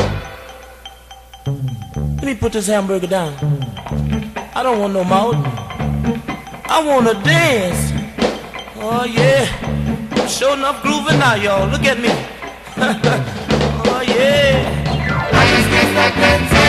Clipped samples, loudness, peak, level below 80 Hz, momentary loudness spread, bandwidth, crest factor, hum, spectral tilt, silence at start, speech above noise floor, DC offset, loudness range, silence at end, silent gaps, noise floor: under 0.1%; -16 LUFS; 0 dBFS; -32 dBFS; 14 LU; 14.5 kHz; 16 dB; none; -5 dB/octave; 0 s; 24 dB; under 0.1%; 6 LU; 0 s; none; -39 dBFS